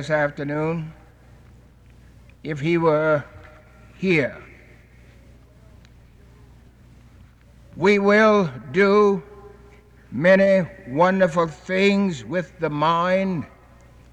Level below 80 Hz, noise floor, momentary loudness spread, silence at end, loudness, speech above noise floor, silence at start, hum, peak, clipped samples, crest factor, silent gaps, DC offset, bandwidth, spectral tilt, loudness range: -52 dBFS; -49 dBFS; 15 LU; 0.65 s; -20 LUFS; 30 dB; 0 s; none; -6 dBFS; under 0.1%; 16 dB; none; under 0.1%; 9.4 kHz; -6.5 dB/octave; 10 LU